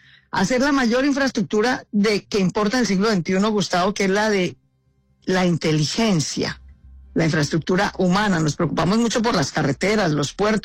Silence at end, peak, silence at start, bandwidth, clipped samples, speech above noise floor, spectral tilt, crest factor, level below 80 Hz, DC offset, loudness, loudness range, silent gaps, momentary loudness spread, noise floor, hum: 0.05 s; -10 dBFS; 0.35 s; 15 kHz; under 0.1%; 43 dB; -5 dB/octave; 10 dB; -46 dBFS; under 0.1%; -20 LUFS; 2 LU; none; 5 LU; -63 dBFS; none